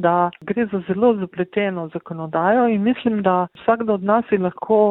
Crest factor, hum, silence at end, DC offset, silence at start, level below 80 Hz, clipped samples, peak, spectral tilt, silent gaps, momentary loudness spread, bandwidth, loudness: 16 dB; none; 0 s; under 0.1%; 0 s; -60 dBFS; under 0.1%; -4 dBFS; -11 dB/octave; none; 7 LU; 4.1 kHz; -20 LUFS